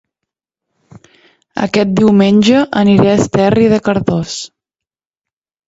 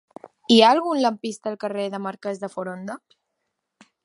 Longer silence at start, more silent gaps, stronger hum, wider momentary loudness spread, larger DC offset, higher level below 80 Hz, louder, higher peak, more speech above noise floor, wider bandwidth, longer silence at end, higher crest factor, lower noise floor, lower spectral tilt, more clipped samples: first, 1.55 s vs 0.5 s; neither; neither; second, 13 LU vs 20 LU; neither; first, -44 dBFS vs -76 dBFS; first, -11 LUFS vs -22 LUFS; about the same, 0 dBFS vs -2 dBFS; first, 76 dB vs 57 dB; second, 8 kHz vs 11.5 kHz; first, 1.2 s vs 1.05 s; second, 14 dB vs 22 dB; first, -86 dBFS vs -79 dBFS; first, -6.5 dB/octave vs -4.5 dB/octave; neither